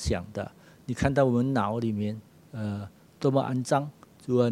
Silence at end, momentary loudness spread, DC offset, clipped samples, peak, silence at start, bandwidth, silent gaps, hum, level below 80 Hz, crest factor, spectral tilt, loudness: 0 s; 18 LU; under 0.1%; under 0.1%; -6 dBFS; 0 s; 13 kHz; none; none; -48 dBFS; 22 dB; -7 dB/octave; -28 LUFS